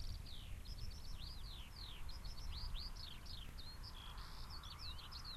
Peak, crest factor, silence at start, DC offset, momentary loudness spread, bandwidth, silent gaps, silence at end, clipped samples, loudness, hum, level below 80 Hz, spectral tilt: -34 dBFS; 14 dB; 0 s; under 0.1%; 4 LU; 13 kHz; none; 0 s; under 0.1%; -52 LUFS; none; -52 dBFS; -3.5 dB/octave